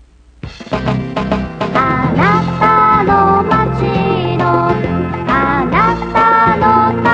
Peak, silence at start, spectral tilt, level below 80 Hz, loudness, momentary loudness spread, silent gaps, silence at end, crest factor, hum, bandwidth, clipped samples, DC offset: 0 dBFS; 0.45 s; -8 dB/octave; -32 dBFS; -12 LUFS; 8 LU; none; 0 s; 12 dB; none; 8 kHz; under 0.1%; under 0.1%